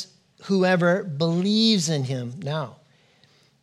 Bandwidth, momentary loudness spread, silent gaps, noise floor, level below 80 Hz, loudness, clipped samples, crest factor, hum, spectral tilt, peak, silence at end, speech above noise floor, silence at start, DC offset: 12.5 kHz; 14 LU; none; -59 dBFS; -74 dBFS; -22 LUFS; under 0.1%; 18 dB; none; -5 dB/octave; -6 dBFS; 0.9 s; 37 dB; 0 s; under 0.1%